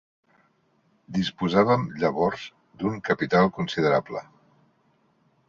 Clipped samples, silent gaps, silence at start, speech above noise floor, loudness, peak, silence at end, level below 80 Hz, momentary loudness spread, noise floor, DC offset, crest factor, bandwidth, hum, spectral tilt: under 0.1%; none; 1.1 s; 42 dB; -24 LUFS; -6 dBFS; 1.25 s; -58 dBFS; 14 LU; -66 dBFS; under 0.1%; 20 dB; 7.4 kHz; none; -7 dB/octave